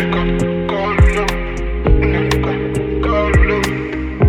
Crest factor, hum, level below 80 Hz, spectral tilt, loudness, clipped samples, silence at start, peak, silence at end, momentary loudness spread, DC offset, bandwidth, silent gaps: 14 dB; none; -20 dBFS; -6.5 dB/octave; -16 LUFS; under 0.1%; 0 s; 0 dBFS; 0 s; 6 LU; under 0.1%; 15 kHz; none